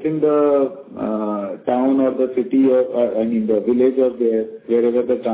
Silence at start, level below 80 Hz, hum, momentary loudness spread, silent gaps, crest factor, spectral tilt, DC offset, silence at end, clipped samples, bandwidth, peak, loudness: 0 s; -60 dBFS; none; 8 LU; none; 14 dB; -11.5 dB/octave; under 0.1%; 0 s; under 0.1%; 4 kHz; -4 dBFS; -18 LUFS